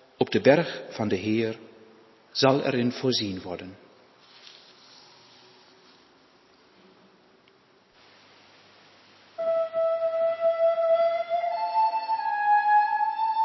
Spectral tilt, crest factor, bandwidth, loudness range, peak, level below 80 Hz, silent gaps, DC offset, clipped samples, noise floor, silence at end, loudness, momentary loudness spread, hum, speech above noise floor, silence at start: -5.5 dB/octave; 22 dB; 6.2 kHz; 12 LU; -6 dBFS; -66 dBFS; none; under 0.1%; under 0.1%; -60 dBFS; 0 s; -25 LUFS; 12 LU; none; 35 dB; 0.2 s